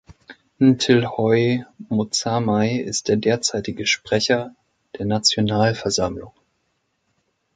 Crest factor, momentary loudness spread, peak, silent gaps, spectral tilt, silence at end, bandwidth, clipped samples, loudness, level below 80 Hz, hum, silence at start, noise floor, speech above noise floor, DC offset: 18 dB; 8 LU; -2 dBFS; none; -4.5 dB/octave; 1.25 s; 9.6 kHz; under 0.1%; -20 LUFS; -52 dBFS; none; 0.3 s; -71 dBFS; 51 dB; under 0.1%